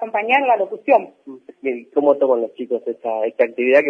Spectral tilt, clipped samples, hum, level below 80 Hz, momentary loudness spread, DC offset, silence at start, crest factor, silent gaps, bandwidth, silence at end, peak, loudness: -6 dB/octave; under 0.1%; none; -82 dBFS; 10 LU; under 0.1%; 0 s; 16 dB; none; 5.2 kHz; 0 s; -2 dBFS; -19 LUFS